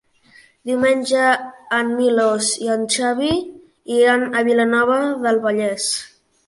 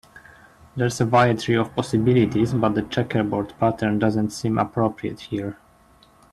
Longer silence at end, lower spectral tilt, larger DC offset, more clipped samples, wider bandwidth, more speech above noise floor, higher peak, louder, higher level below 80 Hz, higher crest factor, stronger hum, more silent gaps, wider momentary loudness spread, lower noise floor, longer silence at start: second, 0.4 s vs 0.8 s; second, -2.5 dB/octave vs -6.5 dB/octave; neither; neither; second, 11.5 kHz vs 13 kHz; about the same, 33 dB vs 33 dB; first, -2 dBFS vs -6 dBFS; first, -18 LUFS vs -22 LUFS; second, -58 dBFS vs -52 dBFS; about the same, 16 dB vs 18 dB; neither; neither; second, 7 LU vs 11 LU; about the same, -51 dBFS vs -54 dBFS; first, 0.65 s vs 0.15 s